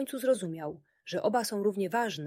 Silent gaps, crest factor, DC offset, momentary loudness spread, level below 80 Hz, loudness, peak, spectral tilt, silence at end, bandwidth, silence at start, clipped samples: none; 16 dB; under 0.1%; 11 LU; -78 dBFS; -31 LUFS; -16 dBFS; -4.5 dB/octave; 0 s; 16.5 kHz; 0 s; under 0.1%